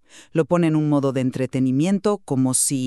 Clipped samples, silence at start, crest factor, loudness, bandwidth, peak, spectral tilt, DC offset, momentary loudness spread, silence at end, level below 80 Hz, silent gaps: under 0.1%; 0.15 s; 14 dB; -21 LUFS; 13.5 kHz; -6 dBFS; -5.5 dB/octave; under 0.1%; 5 LU; 0 s; -60 dBFS; none